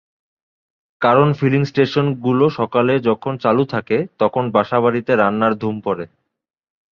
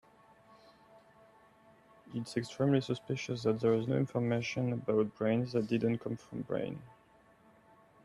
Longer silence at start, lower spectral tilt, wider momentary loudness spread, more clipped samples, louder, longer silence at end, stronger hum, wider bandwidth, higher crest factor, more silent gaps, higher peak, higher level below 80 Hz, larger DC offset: second, 1 s vs 2.05 s; first, -8.5 dB/octave vs -7 dB/octave; second, 7 LU vs 10 LU; neither; first, -17 LUFS vs -34 LUFS; second, 0.85 s vs 1.15 s; neither; second, 6.8 kHz vs 11.5 kHz; about the same, 16 dB vs 18 dB; neither; first, -2 dBFS vs -16 dBFS; first, -58 dBFS vs -70 dBFS; neither